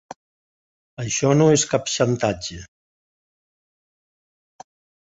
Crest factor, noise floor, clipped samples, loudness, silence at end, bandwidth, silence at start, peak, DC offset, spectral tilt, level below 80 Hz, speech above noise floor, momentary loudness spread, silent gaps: 20 dB; under -90 dBFS; under 0.1%; -19 LUFS; 2.4 s; 8.2 kHz; 0.1 s; -4 dBFS; under 0.1%; -4.5 dB/octave; -54 dBFS; over 70 dB; 17 LU; 0.16-0.97 s